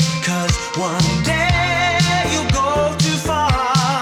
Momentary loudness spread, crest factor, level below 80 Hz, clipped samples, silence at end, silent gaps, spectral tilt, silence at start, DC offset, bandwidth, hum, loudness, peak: 3 LU; 14 dB; -30 dBFS; under 0.1%; 0 s; none; -4 dB/octave; 0 s; under 0.1%; 15 kHz; none; -17 LUFS; -2 dBFS